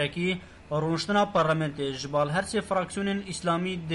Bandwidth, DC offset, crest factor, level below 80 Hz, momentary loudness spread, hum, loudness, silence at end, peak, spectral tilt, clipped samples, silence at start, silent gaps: 11.5 kHz; under 0.1%; 14 dB; -56 dBFS; 6 LU; none; -28 LUFS; 0 s; -14 dBFS; -5 dB/octave; under 0.1%; 0 s; none